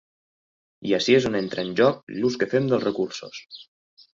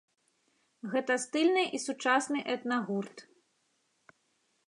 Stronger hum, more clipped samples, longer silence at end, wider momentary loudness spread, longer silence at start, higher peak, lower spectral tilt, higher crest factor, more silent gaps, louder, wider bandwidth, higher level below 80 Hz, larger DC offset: neither; neither; second, 0.55 s vs 1.45 s; first, 19 LU vs 9 LU; about the same, 0.8 s vs 0.85 s; first, -6 dBFS vs -12 dBFS; first, -5.5 dB/octave vs -3.5 dB/octave; about the same, 18 dB vs 20 dB; first, 2.03-2.07 s vs none; first, -23 LUFS vs -31 LUFS; second, 7.6 kHz vs 11 kHz; first, -62 dBFS vs -88 dBFS; neither